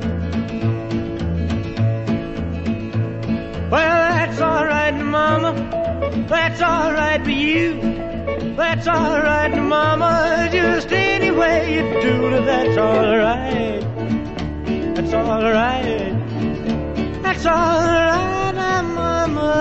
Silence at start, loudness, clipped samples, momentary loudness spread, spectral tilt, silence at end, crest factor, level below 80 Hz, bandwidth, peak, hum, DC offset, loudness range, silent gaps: 0 s; -18 LUFS; under 0.1%; 8 LU; -6.5 dB/octave; 0 s; 14 dB; -34 dBFS; 8.2 kHz; -4 dBFS; none; under 0.1%; 4 LU; none